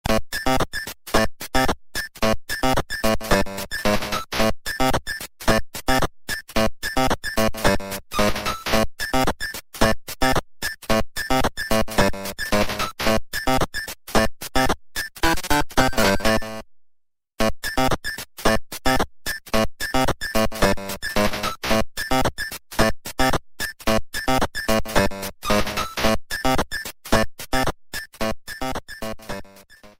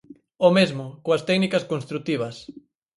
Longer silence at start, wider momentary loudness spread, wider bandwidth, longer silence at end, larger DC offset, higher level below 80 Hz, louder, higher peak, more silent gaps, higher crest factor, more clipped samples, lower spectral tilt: second, 0.05 s vs 0.4 s; second, 8 LU vs 13 LU; first, 16.5 kHz vs 11.5 kHz; second, 0.1 s vs 0.4 s; neither; first, -32 dBFS vs -66 dBFS; about the same, -23 LUFS vs -23 LUFS; about the same, -2 dBFS vs -4 dBFS; neither; about the same, 20 dB vs 20 dB; neither; second, -4 dB/octave vs -6 dB/octave